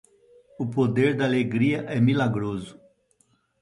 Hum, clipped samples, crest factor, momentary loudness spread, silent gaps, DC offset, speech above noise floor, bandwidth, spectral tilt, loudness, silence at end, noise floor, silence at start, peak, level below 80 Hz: none; under 0.1%; 16 dB; 11 LU; none; under 0.1%; 43 dB; 11 kHz; -8 dB/octave; -24 LUFS; 0.9 s; -66 dBFS; 0.6 s; -8 dBFS; -58 dBFS